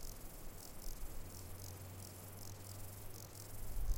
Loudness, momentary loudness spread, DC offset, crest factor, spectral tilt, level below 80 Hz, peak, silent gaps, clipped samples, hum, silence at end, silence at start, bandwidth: -51 LUFS; 2 LU; under 0.1%; 18 dB; -4 dB/octave; -48 dBFS; -26 dBFS; none; under 0.1%; none; 0 s; 0 s; 17 kHz